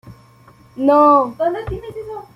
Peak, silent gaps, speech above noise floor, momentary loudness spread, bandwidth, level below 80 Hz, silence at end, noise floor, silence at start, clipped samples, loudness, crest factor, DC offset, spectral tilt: -2 dBFS; none; 31 dB; 18 LU; 10.5 kHz; -42 dBFS; 0.15 s; -47 dBFS; 0.05 s; under 0.1%; -15 LUFS; 16 dB; under 0.1%; -8 dB/octave